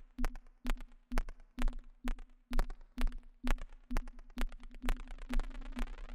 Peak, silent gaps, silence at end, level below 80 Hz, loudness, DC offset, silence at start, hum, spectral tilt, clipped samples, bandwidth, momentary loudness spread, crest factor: -16 dBFS; none; 0 s; -38 dBFS; -45 LUFS; under 0.1%; 0 s; none; -5 dB/octave; under 0.1%; 12.5 kHz; 5 LU; 20 dB